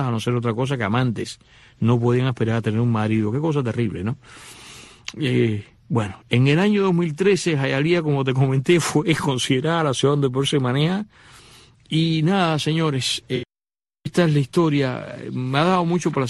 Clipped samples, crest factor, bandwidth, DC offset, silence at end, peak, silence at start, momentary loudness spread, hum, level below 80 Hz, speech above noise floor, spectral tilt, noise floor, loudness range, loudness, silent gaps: under 0.1%; 16 dB; 12.5 kHz; under 0.1%; 0 s; -6 dBFS; 0 s; 12 LU; none; -54 dBFS; over 70 dB; -6 dB/octave; under -90 dBFS; 4 LU; -21 LUFS; none